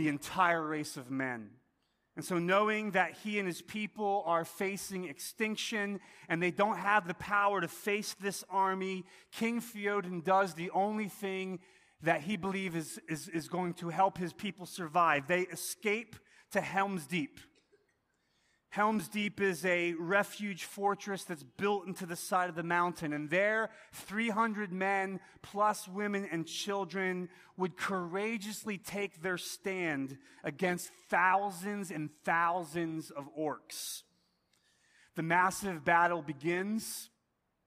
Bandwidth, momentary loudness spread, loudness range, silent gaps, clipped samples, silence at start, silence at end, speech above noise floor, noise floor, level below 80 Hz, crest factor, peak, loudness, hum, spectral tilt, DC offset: 15.5 kHz; 11 LU; 4 LU; none; under 0.1%; 0 s; 0.6 s; 46 dB; -81 dBFS; -74 dBFS; 22 dB; -14 dBFS; -34 LUFS; none; -4.5 dB/octave; under 0.1%